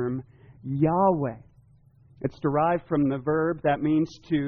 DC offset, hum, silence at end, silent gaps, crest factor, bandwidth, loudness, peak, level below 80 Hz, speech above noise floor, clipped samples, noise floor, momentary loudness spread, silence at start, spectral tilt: under 0.1%; none; 0 s; none; 16 dB; 6.4 kHz; -26 LUFS; -10 dBFS; -56 dBFS; 32 dB; under 0.1%; -57 dBFS; 12 LU; 0 s; -7.5 dB/octave